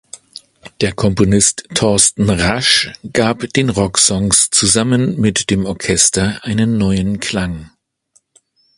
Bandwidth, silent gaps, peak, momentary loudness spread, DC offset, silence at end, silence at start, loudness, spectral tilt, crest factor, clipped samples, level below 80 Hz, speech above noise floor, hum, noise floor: 11.5 kHz; none; 0 dBFS; 8 LU; under 0.1%; 1.1 s; 0.15 s; -13 LUFS; -3.5 dB/octave; 16 dB; under 0.1%; -36 dBFS; 44 dB; none; -58 dBFS